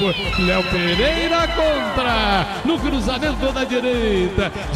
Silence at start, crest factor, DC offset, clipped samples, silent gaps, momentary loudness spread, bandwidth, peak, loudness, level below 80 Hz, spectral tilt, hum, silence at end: 0 s; 14 dB; under 0.1%; under 0.1%; none; 4 LU; 15 kHz; -6 dBFS; -19 LUFS; -30 dBFS; -5 dB/octave; none; 0 s